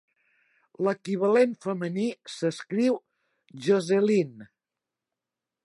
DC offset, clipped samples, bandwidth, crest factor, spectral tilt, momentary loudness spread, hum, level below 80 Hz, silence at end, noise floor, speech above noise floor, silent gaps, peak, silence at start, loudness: under 0.1%; under 0.1%; 11.5 kHz; 18 dB; -6.5 dB/octave; 9 LU; none; -80 dBFS; 1.2 s; -89 dBFS; 63 dB; none; -10 dBFS; 0.8 s; -26 LUFS